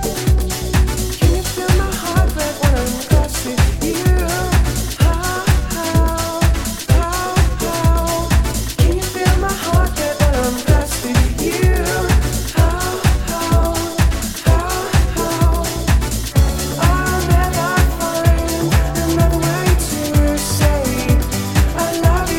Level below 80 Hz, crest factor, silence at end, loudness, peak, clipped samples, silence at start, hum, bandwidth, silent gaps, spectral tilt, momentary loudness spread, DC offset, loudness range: -18 dBFS; 14 dB; 0 s; -17 LUFS; 0 dBFS; under 0.1%; 0 s; none; 17.5 kHz; none; -5 dB/octave; 2 LU; under 0.1%; 1 LU